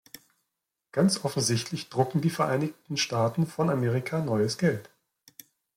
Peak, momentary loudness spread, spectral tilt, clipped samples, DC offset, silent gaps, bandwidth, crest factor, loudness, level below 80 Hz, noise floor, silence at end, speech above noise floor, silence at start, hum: -8 dBFS; 5 LU; -5 dB/octave; under 0.1%; under 0.1%; none; 16.5 kHz; 20 dB; -27 LUFS; -66 dBFS; -84 dBFS; 0.95 s; 57 dB; 0.95 s; none